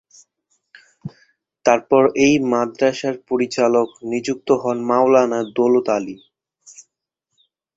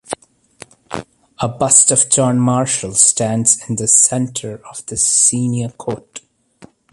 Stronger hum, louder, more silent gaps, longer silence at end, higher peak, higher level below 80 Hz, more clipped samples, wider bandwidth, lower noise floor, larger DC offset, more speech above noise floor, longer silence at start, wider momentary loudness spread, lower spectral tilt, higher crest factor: neither; second, -18 LUFS vs -13 LUFS; neither; first, 0.95 s vs 0.75 s; about the same, 0 dBFS vs 0 dBFS; second, -60 dBFS vs -52 dBFS; neither; second, 8 kHz vs 12.5 kHz; first, -77 dBFS vs -46 dBFS; neither; first, 60 dB vs 31 dB; first, 1.05 s vs 0.1 s; second, 11 LU vs 20 LU; first, -5 dB/octave vs -3.5 dB/octave; about the same, 18 dB vs 16 dB